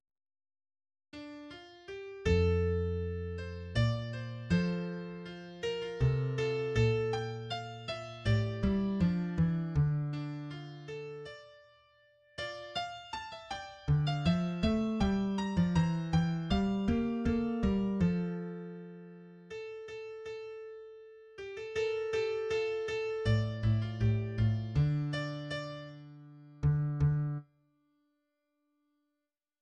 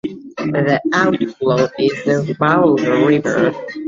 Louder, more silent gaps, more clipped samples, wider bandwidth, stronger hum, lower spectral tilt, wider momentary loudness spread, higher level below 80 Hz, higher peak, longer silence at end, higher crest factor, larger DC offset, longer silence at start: second, -33 LUFS vs -16 LUFS; neither; neither; first, 9.4 kHz vs 7.6 kHz; neither; about the same, -7.5 dB/octave vs -6.5 dB/octave; first, 17 LU vs 5 LU; first, -48 dBFS vs -54 dBFS; second, -18 dBFS vs -2 dBFS; first, 2.2 s vs 0 s; about the same, 16 dB vs 14 dB; neither; first, 1.15 s vs 0.05 s